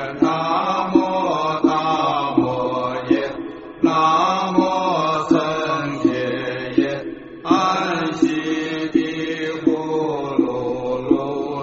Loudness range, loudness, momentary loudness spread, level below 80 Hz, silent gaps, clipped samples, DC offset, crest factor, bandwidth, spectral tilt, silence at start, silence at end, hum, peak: 2 LU; -20 LUFS; 6 LU; -54 dBFS; none; under 0.1%; under 0.1%; 18 dB; 7.8 kHz; -4 dB/octave; 0 s; 0 s; none; -2 dBFS